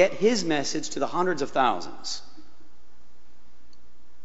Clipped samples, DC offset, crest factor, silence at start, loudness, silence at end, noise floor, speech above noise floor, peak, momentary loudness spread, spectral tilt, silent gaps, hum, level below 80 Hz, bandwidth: under 0.1%; 3%; 22 dB; 0 s; -26 LUFS; 1.85 s; -60 dBFS; 35 dB; -6 dBFS; 11 LU; -3.5 dB/octave; none; none; -62 dBFS; 8.2 kHz